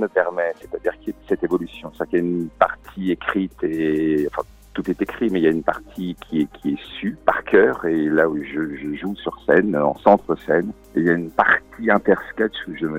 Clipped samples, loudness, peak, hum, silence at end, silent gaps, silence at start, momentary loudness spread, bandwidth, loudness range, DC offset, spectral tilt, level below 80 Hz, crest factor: under 0.1%; -21 LUFS; 0 dBFS; none; 0 s; none; 0 s; 11 LU; 16 kHz; 4 LU; under 0.1%; -7.5 dB/octave; -50 dBFS; 20 dB